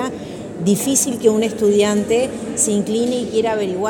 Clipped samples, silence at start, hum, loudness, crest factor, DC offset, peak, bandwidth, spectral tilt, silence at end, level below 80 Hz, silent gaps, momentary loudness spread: under 0.1%; 0 s; none; -17 LUFS; 16 dB; under 0.1%; -2 dBFS; 17.5 kHz; -4 dB/octave; 0 s; -52 dBFS; none; 7 LU